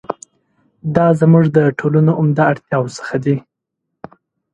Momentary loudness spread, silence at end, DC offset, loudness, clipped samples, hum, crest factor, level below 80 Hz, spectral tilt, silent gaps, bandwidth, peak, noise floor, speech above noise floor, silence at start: 11 LU; 1.15 s; under 0.1%; -14 LUFS; under 0.1%; none; 16 dB; -54 dBFS; -8.5 dB/octave; none; 8.8 kHz; 0 dBFS; -77 dBFS; 63 dB; 0.1 s